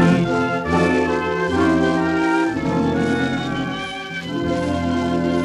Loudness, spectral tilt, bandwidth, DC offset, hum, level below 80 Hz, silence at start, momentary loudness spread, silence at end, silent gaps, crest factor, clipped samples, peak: -20 LUFS; -6.5 dB/octave; 11.5 kHz; under 0.1%; none; -46 dBFS; 0 s; 7 LU; 0 s; none; 16 dB; under 0.1%; -4 dBFS